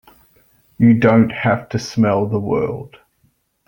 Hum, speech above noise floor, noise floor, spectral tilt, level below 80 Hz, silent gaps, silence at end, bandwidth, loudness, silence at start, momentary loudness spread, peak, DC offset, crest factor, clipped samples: none; 47 dB; -62 dBFS; -7.5 dB/octave; -50 dBFS; none; 0.8 s; 17 kHz; -16 LUFS; 0.8 s; 10 LU; -2 dBFS; under 0.1%; 16 dB; under 0.1%